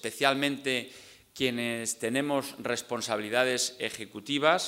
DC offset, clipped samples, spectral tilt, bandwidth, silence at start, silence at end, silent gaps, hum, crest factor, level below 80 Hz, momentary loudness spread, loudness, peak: under 0.1%; under 0.1%; -2.5 dB/octave; 16 kHz; 0.05 s; 0 s; none; none; 22 dB; -72 dBFS; 9 LU; -29 LUFS; -8 dBFS